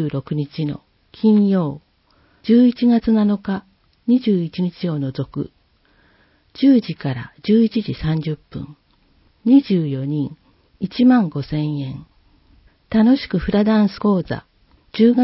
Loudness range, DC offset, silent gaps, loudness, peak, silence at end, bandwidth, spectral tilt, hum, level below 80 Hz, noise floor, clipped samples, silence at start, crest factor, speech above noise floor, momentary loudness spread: 3 LU; under 0.1%; none; -18 LUFS; -2 dBFS; 0 s; 5.8 kHz; -12 dB/octave; none; -46 dBFS; -58 dBFS; under 0.1%; 0 s; 16 dB; 41 dB; 15 LU